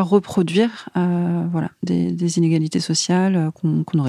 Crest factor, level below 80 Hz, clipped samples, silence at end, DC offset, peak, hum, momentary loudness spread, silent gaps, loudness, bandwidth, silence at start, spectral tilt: 16 dB; -58 dBFS; under 0.1%; 0 s; under 0.1%; -2 dBFS; none; 5 LU; none; -20 LUFS; 11.5 kHz; 0 s; -6 dB/octave